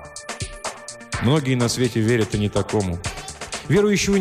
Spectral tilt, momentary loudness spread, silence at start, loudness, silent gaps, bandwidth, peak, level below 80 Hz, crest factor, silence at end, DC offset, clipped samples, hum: -5 dB/octave; 13 LU; 0 s; -22 LUFS; none; 15.5 kHz; -6 dBFS; -42 dBFS; 14 dB; 0 s; under 0.1%; under 0.1%; none